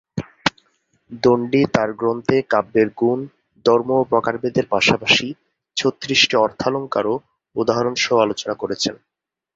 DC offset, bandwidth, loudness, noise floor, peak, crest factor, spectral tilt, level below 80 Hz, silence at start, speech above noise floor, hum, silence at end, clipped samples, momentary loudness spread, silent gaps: under 0.1%; 7.8 kHz; -19 LUFS; -64 dBFS; 0 dBFS; 18 dB; -4 dB/octave; -54 dBFS; 0.15 s; 46 dB; none; 0.6 s; under 0.1%; 9 LU; none